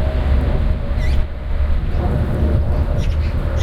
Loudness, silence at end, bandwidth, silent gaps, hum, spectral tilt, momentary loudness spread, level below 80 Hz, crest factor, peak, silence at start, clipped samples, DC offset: -20 LUFS; 0 s; 6.4 kHz; none; none; -8 dB/octave; 3 LU; -18 dBFS; 12 dB; -4 dBFS; 0 s; under 0.1%; under 0.1%